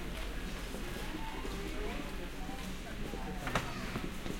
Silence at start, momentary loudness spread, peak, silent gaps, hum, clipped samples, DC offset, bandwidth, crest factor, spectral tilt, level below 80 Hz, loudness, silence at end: 0 s; 6 LU; -18 dBFS; none; none; under 0.1%; under 0.1%; 16.5 kHz; 20 dB; -4.5 dB/octave; -44 dBFS; -41 LUFS; 0 s